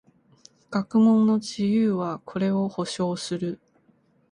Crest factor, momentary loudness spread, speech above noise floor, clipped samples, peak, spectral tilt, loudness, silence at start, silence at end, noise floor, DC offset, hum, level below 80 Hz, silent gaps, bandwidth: 14 dB; 12 LU; 40 dB; under 0.1%; -10 dBFS; -6.5 dB/octave; -24 LUFS; 0.7 s; 0.75 s; -63 dBFS; under 0.1%; none; -66 dBFS; none; 10.5 kHz